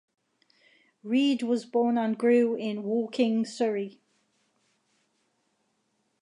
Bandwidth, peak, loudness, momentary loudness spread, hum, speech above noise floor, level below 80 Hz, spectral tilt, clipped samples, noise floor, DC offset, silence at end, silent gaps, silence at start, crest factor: 10.5 kHz; -12 dBFS; -27 LUFS; 8 LU; none; 49 dB; -84 dBFS; -5.5 dB/octave; under 0.1%; -75 dBFS; under 0.1%; 2.3 s; none; 1.05 s; 16 dB